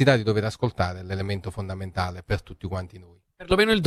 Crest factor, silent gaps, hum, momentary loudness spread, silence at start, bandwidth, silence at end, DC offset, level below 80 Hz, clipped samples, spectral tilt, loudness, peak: 18 dB; none; none; 12 LU; 0 s; 13.5 kHz; 0 s; under 0.1%; -44 dBFS; under 0.1%; -6 dB/octave; -27 LUFS; -6 dBFS